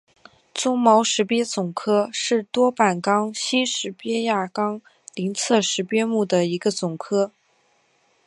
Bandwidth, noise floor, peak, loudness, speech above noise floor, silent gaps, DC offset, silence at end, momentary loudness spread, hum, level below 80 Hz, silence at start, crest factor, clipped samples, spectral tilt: 11.5 kHz; -63 dBFS; -2 dBFS; -22 LUFS; 42 dB; none; under 0.1%; 1 s; 9 LU; none; -74 dBFS; 0.55 s; 20 dB; under 0.1%; -3.5 dB/octave